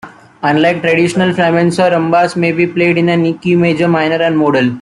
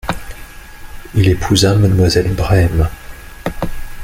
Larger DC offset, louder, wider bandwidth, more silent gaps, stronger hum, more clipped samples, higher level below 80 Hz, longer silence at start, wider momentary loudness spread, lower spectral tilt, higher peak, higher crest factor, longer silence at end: neither; about the same, -12 LUFS vs -14 LUFS; second, 11.5 kHz vs 16 kHz; neither; neither; neither; second, -52 dBFS vs -26 dBFS; about the same, 0.05 s vs 0.05 s; second, 2 LU vs 21 LU; about the same, -6.5 dB/octave vs -5.5 dB/octave; about the same, 0 dBFS vs 0 dBFS; about the same, 10 dB vs 14 dB; about the same, 0 s vs 0 s